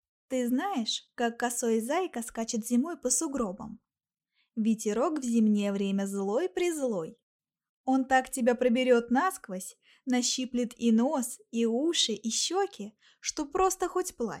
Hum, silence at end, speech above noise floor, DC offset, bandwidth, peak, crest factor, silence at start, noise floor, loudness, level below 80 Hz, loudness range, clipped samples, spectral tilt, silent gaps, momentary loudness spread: none; 0 s; over 61 dB; under 0.1%; 16.5 kHz; -12 dBFS; 18 dB; 0.3 s; under -90 dBFS; -29 LUFS; -64 dBFS; 3 LU; under 0.1%; -3.5 dB/octave; 7.23-7.39 s, 7.69-7.84 s; 11 LU